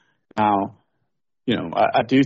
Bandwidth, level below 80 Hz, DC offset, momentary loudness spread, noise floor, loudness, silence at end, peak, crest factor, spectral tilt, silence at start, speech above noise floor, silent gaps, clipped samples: 7.4 kHz; -60 dBFS; under 0.1%; 13 LU; -77 dBFS; -22 LUFS; 0 s; -6 dBFS; 16 dB; -4.5 dB/octave; 0.35 s; 58 dB; none; under 0.1%